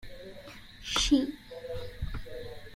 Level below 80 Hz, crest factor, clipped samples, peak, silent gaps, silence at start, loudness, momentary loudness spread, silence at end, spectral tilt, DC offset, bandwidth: -44 dBFS; 20 dB; under 0.1%; -12 dBFS; none; 0 s; -31 LUFS; 21 LU; 0 s; -3.5 dB/octave; under 0.1%; 15.5 kHz